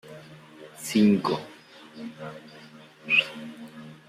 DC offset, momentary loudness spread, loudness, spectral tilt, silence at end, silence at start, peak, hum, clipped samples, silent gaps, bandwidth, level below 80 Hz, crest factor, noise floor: under 0.1%; 25 LU; -24 LUFS; -5 dB/octave; 0.15 s; 0.05 s; -8 dBFS; none; under 0.1%; none; 15.5 kHz; -70 dBFS; 20 dB; -49 dBFS